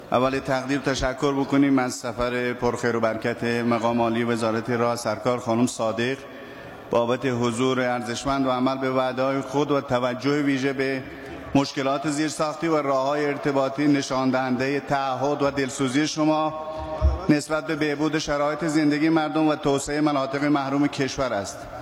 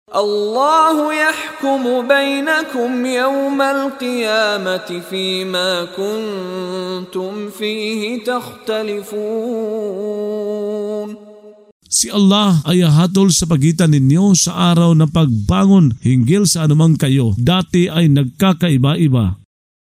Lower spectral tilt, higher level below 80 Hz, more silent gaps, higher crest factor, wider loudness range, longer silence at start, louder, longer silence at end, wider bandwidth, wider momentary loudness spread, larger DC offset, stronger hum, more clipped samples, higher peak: about the same, -5.5 dB/octave vs -5 dB/octave; about the same, -42 dBFS vs -42 dBFS; second, none vs 11.72-11.80 s; about the same, 18 dB vs 14 dB; second, 2 LU vs 9 LU; about the same, 0 s vs 0.1 s; second, -24 LUFS vs -15 LUFS; second, 0 s vs 0.55 s; second, 14.5 kHz vs 16 kHz; second, 5 LU vs 11 LU; neither; neither; neither; second, -6 dBFS vs 0 dBFS